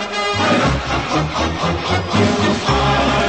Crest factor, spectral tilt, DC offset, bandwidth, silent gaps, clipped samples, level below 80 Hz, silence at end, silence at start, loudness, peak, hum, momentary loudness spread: 14 dB; -5 dB/octave; 0.2%; 8.8 kHz; none; under 0.1%; -30 dBFS; 0 s; 0 s; -17 LUFS; -4 dBFS; none; 4 LU